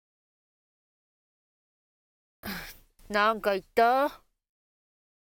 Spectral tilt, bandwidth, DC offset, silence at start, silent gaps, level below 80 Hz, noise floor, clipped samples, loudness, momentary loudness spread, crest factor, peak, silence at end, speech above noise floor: -4 dB/octave; 18 kHz; under 0.1%; 2.45 s; none; -60 dBFS; -48 dBFS; under 0.1%; -26 LUFS; 16 LU; 22 dB; -10 dBFS; 1.15 s; 23 dB